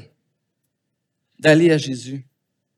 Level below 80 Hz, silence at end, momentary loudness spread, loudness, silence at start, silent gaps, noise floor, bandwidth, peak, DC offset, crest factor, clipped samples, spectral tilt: -80 dBFS; 0.55 s; 20 LU; -17 LUFS; 1.45 s; none; -76 dBFS; 12 kHz; -2 dBFS; under 0.1%; 20 dB; under 0.1%; -6 dB/octave